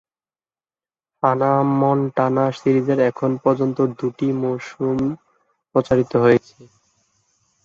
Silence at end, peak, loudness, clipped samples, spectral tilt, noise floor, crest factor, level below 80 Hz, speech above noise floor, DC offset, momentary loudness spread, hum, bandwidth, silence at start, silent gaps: 1 s; -2 dBFS; -19 LUFS; under 0.1%; -8.5 dB/octave; under -90 dBFS; 18 dB; -56 dBFS; over 72 dB; under 0.1%; 7 LU; none; 7.4 kHz; 1.25 s; none